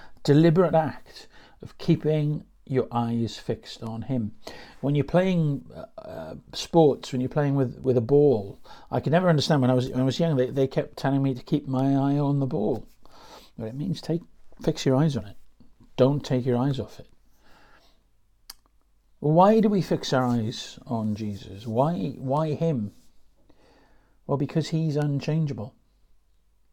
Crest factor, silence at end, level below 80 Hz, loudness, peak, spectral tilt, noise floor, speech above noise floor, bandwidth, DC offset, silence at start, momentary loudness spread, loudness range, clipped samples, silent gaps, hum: 18 dB; 1.05 s; -54 dBFS; -25 LUFS; -6 dBFS; -7.5 dB/octave; -62 dBFS; 38 dB; 13.5 kHz; under 0.1%; 0.05 s; 16 LU; 6 LU; under 0.1%; none; none